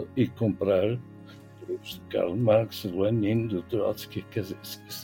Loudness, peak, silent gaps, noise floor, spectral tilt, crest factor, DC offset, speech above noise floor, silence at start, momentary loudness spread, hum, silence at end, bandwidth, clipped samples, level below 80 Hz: -28 LUFS; -10 dBFS; none; -47 dBFS; -7 dB/octave; 18 dB; under 0.1%; 20 dB; 0 s; 14 LU; none; 0 s; 17 kHz; under 0.1%; -62 dBFS